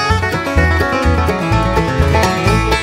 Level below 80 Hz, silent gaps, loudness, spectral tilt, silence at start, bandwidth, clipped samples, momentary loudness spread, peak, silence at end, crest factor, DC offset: -20 dBFS; none; -14 LUFS; -5.5 dB/octave; 0 s; 16 kHz; under 0.1%; 2 LU; 0 dBFS; 0 s; 14 dB; under 0.1%